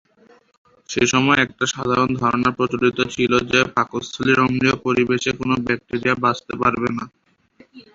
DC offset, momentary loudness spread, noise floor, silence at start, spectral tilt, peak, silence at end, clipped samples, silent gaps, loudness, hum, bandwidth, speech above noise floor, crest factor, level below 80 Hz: under 0.1%; 6 LU; -53 dBFS; 0.9 s; -4.5 dB/octave; -2 dBFS; 0.15 s; under 0.1%; none; -19 LUFS; none; 7.8 kHz; 34 dB; 18 dB; -50 dBFS